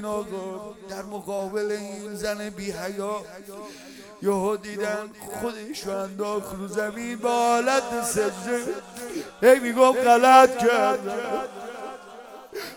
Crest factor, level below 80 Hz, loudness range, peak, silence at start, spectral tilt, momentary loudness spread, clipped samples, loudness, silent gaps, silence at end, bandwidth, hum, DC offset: 22 dB; -60 dBFS; 12 LU; -2 dBFS; 0 s; -3.5 dB/octave; 20 LU; under 0.1%; -23 LUFS; none; 0 s; 18 kHz; none; under 0.1%